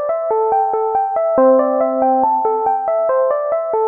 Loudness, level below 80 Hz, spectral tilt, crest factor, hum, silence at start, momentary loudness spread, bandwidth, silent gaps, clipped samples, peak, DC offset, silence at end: -16 LUFS; -60 dBFS; -7 dB/octave; 12 dB; none; 0 s; 5 LU; 2.8 kHz; none; under 0.1%; -2 dBFS; under 0.1%; 0 s